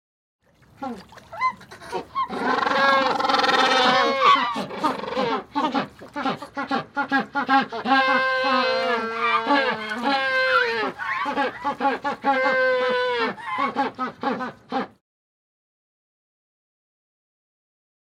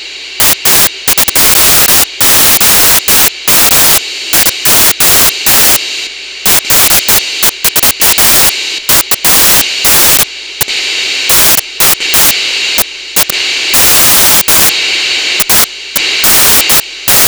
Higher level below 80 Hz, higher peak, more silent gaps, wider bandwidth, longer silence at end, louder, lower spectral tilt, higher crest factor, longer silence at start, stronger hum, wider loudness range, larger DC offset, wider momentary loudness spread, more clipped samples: second, -64 dBFS vs -34 dBFS; second, -4 dBFS vs 0 dBFS; neither; second, 15 kHz vs over 20 kHz; first, 3.35 s vs 0 s; second, -22 LUFS vs -5 LUFS; first, -3.5 dB/octave vs 0 dB/octave; first, 20 dB vs 8 dB; first, 0.8 s vs 0 s; neither; first, 10 LU vs 2 LU; neither; first, 12 LU vs 7 LU; neither